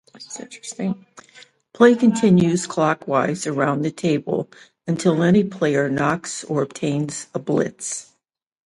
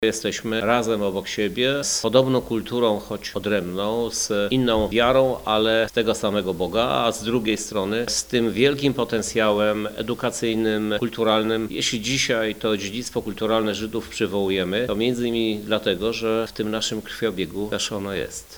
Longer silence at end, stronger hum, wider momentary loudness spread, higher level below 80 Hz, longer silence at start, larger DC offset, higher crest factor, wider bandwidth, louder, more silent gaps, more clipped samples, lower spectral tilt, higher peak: first, 0.65 s vs 0 s; neither; first, 16 LU vs 7 LU; second, -58 dBFS vs -48 dBFS; first, 0.15 s vs 0 s; neither; about the same, 20 dB vs 22 dB; second, 11.5 kHz vs over 20 kHz; about the same, -20 LUFS vs -22 LUFS; neither; neither; first, -6 dB/octave vs -4 dB/octave; about the same, 0 dBFS vs -2 dBFS